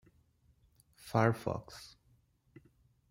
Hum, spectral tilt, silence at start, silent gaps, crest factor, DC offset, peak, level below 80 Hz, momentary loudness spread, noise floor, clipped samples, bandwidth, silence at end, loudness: none; -7 dB/octave; 1.05 s; none; 26 dB; under 0.1%; -14 dBFS; -66 dBFS; 24 LU; -71 dBFS; under 0.1%; 16 kHz; 1.25 s; -34 LUFS